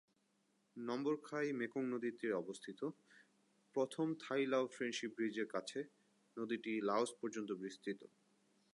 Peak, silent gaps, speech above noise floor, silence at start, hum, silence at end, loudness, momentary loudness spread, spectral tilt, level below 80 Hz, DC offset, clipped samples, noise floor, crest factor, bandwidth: -24 dBFS; none; 38 dB; 0.75 s; none; 0.7 s; -42 LUFS; 10 LU; -5 dB/octave; under -90 dBFS; under 0.1%; under 0.1%; -80 dBFS; 18 dB; 11.5 kHz